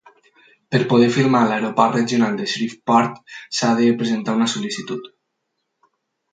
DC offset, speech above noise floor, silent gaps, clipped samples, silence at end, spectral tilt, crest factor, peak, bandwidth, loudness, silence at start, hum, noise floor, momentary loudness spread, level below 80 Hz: under 0.1%; 57 dB; none; under 0.1%; 1.25 s; -5 dB/octave; 20 dB; 0 dBFS; 9.2 kHz; -19 LUFS; 0.7 s; none; -75 dBFS; 11 LU; -66 dBFS